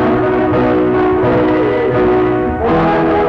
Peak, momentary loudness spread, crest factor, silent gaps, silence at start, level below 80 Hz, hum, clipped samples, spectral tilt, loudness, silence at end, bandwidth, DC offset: -6 dBFS; 1 LU; 6 dB; none; 0 s; -32 dBFS; none; under 0.1%; -9 dB/octave; -13 LUFS; 0 s; 5.8 kHz; under 0.1%